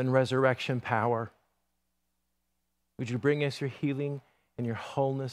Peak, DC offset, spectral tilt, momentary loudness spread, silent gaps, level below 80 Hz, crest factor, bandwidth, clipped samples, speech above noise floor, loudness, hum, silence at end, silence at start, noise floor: -10 dBFS; under 0.1%; -7 dB/octave; 12 LU; none; -72 dBFS; 22 dB; 11.5 kHz; under 0.1%; 51 dB; -30 LUFS; none; 0 s; 0 s; -81 dBFS